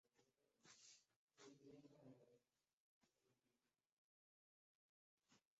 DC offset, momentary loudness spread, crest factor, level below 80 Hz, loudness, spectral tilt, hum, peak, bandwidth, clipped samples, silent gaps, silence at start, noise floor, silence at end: under 0.1%; 2 LU; 20 dB; under -90 dBFS; -68 LUFS; -4 dB/octave; none; -54 dBFS; 7.6 kHz; under 0.1%; 1.16-1.28 s, 2.73-3.01 s, 3.92-5.18 s; 0.05 s; under -90 dBFS; 0.2 s